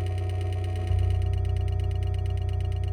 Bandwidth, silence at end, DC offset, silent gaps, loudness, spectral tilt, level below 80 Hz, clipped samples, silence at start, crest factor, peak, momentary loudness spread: 9.6 kHz; 0 s; under 0.1%; none; -28 LUFS; -7.5 dB/octave; -32 dBFS; under 0.1%; 0 s; 10 dB; -16 dBFS; 3 LU